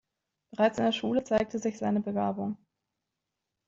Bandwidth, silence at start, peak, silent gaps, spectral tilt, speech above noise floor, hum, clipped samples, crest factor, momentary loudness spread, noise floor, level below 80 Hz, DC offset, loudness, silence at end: 7.8 kHz; 0.55 s; -12 dBFS; none; -6 dB/octave; 57 dB; none; under 0.1%; 20 dB; 10 LU; -86 dBFS; -64 dBFS; under 0.1%; -29 LUFS; 1.1 s